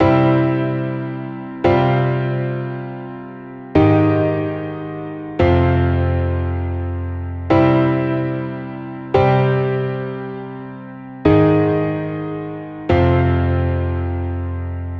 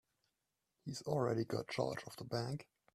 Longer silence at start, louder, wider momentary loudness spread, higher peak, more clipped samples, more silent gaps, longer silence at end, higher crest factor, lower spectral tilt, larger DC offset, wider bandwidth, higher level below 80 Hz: second, 0 s vs 0.85 s; first, -18 LUFS vs -41 LUFS; first, 15 LU vs 11 LU; first, 0 dBFS vs -22 dBFS; neither; neither; second, 0 s vs 0.3 s; about the same, 16 dB vs 20 dB; first, -10 dB/octave vs -6 dB/octave; neither; second, 5.8 kHz vs 15 kHz; first, -34 dBFS vs -74 dBFS